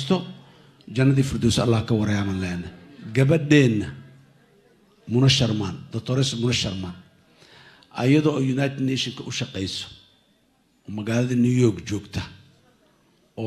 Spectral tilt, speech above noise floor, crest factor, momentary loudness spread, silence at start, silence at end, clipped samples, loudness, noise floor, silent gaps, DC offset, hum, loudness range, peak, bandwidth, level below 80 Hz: -6 dB/octave; 42 dB; 20 dB; 17 LU; 0 s; 0 s; under 0.1%; -22 LUFS; -63 dBFS; none; under 0.1%; none; 4 LU; -4 dBFS; 12.5 kHz; -50 dBFS